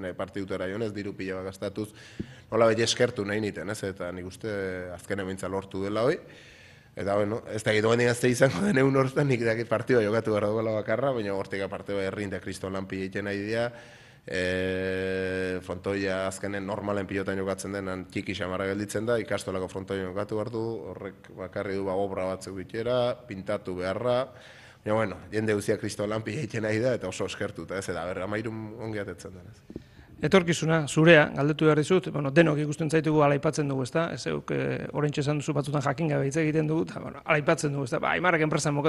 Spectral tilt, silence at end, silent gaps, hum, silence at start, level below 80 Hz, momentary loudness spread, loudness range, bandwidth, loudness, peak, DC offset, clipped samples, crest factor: -5.5 dB/octave; 0 s; none; none; 0 s; -60 dBFS; 12 LU; 8 LU; 12.5 kHz; -28 LUFS; -6 dBFS; under 0.1%; under 0.1%; 22 dB